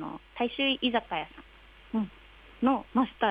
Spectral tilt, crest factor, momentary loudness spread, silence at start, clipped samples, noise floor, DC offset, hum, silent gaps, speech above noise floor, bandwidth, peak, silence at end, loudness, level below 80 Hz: -7 dB/octave; 18 dB; 11 LU; 0 s; under 0.1%; -54 dBFS; under 0.1%; none; none; 25 dB; 5 kHz; -12 dBFS; 0 s; -30 LUFS; -58 dBFS